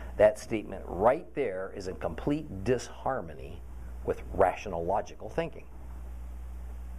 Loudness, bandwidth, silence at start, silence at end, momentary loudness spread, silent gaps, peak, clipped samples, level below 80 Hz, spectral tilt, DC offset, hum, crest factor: -31 LUFS; 14.5 kHz; 0 s; 0 s; 18 LU; none; -10 dBFS; under 0.1%; -44 dBFS; -6.5 dB/octave; 0.4%; none; 22 dB